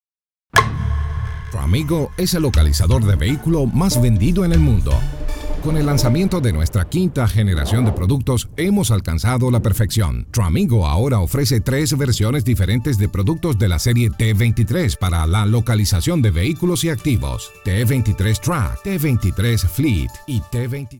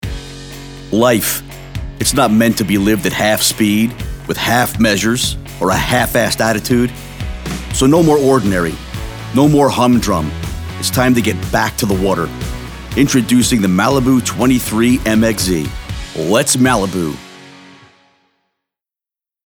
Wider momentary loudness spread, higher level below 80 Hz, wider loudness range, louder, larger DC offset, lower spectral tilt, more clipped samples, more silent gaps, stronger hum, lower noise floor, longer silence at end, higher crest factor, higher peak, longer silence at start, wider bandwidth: second, 6 LU vs 14 LU; first, -26 dBFS vs -32 dBFS; about the same, 2 LU vs 3 LU; second, -18 LUFS vs -14 LUFS; neither; first, -6 dB/octave vs -4.5 dB/octave; neither; neither; neither; about the same, under -90 dBFS vs -87 dBFS; second, 0 s vs 1.85 s; about the same, 16 dB vs 14 dB; about the same, 0 dBFS vs 0 dBFS; first, 0.55 s vs 0.05 s; second, 17.5 kHz vs over 20 kHz